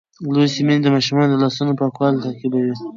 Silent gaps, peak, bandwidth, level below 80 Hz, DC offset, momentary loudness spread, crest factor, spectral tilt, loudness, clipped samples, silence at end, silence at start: none; -4 dBFS; 7.6 kHz; -64 dBFS; under 0.1%; 6 LU; 14 dB; -6.5 dB/octave; -18 LUFS; under 0.1%; 0 s; 0.2 s